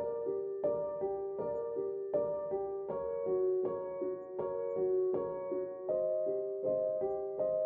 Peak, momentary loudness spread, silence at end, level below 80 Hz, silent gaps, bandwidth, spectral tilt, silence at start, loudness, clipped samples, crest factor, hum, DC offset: -20 dBFS; 6 LU; 0 s; -72 dBFS; none; 2.5 kHz; -10 dB/octave; 0 s; -36 LUFS; under 0.1%; 14 dB; none; under 0.1%